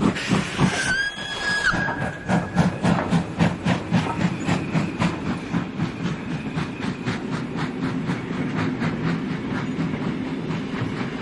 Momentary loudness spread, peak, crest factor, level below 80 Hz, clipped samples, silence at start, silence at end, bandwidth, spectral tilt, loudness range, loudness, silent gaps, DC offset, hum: 7 LU; -6 dBFS; 18 dB; -46 dBFS; under 0.1%; 0 s; 0 s; 11.5 kHz; -5.5 dB/octave; 5 LU; -24 LUFS; none; under 0.1%; none